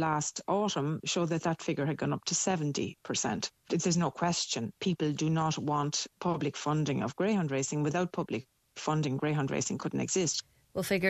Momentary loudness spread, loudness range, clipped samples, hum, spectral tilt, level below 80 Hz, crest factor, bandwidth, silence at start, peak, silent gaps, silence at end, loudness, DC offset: 4 LU; 1 LU; under 0.1%; none; -4.5 dB/octave; -66 dBFS; 18 dB; 14 kHz; 0 s; -14 dBFS; none; 0 s; -32 LUFS; under 0.1%